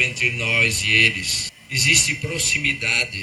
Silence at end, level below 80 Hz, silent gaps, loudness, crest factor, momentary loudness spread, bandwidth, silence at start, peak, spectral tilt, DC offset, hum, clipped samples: 0 s; -44 dBFS; none; -17 LUFS; 20 dB; 7 LU; 14.5 kHz; 0 s; 0 dBFS; -1.5 dB/octave; under 0.1%; none; under 0.1%